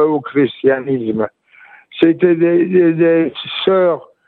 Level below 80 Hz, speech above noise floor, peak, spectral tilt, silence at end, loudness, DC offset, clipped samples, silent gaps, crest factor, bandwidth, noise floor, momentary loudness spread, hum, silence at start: -62 dBFS; 31 dB; 0 dBFS; -9.5 dB/octave; 0.25 s; -14 LUFS; under 0.1%; under 0.1%; none; 14 dB; 4.3 kHz; -44 dBFS; 8 LU; none; 0 s